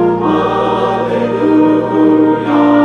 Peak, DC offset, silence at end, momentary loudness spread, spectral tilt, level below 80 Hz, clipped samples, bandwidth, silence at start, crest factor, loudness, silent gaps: 0 dBFS; under 0.1%; 0 s; 4 LU; -8 dB/octave; -44 dBFS; under 0.1%; 6.6 kHz; 0 s; 10 dB; -12 LUFS; none